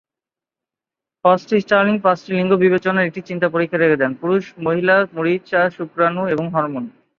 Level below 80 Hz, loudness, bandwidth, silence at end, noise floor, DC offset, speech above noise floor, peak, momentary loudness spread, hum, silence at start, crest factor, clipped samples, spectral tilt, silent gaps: -62 dBFS; -18 LUFS; 7 kHz; 0.3 s; -88 dBFS; under 0.1%; 71 dB; 0 dBFS; 6 LU; none; 1.25 s; 18 dB; under 0.1%; -7.5 dB/octave; none